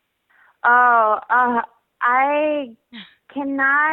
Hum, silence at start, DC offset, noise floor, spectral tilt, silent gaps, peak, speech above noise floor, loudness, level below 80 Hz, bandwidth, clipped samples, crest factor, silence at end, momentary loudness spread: none; 0.65 s; under 0.1%; -58 dBFS; -7 dB/octave; none; -2 dBFS; 40 dB; -17 LUFS; -70 dBFS; 4.2 kHz; under 0.1%; 16 dB; 0 s; 16 LU